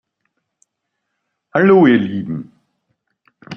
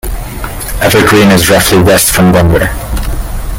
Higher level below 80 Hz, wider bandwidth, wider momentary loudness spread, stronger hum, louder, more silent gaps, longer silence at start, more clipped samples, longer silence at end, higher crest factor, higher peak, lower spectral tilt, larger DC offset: second, -60 dBFS vs -18 dBFS; second, 6 kHz vs 17.5 kHz; first, 17 LU vs 14 LU; neither; second, -14 LUFS vs -7 LUFS; neither; first, 1.55 s vs 0.05 s; second, under 0.1% vs 0.2%; about the same, 0 s vs 0 s; first, 16 dB vs 8 dB; about the same, -2 dBFS vs 0 dBFS; first, -9 dB/octave vs -4.5 dB/octave; neither